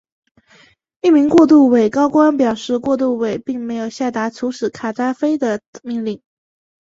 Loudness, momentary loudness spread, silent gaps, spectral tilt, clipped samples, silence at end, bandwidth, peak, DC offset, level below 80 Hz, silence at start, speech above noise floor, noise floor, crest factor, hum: -16 LUFS; 14 LU; 5.67-5.73 s; -6 dB/octave; under 0.1%; 0.65 s; 7.8 kHz; -2 dBFS; under 0.1%; -58 dBFS; 1.05 s; 36 dB; -51 dBFS; 16 dB; none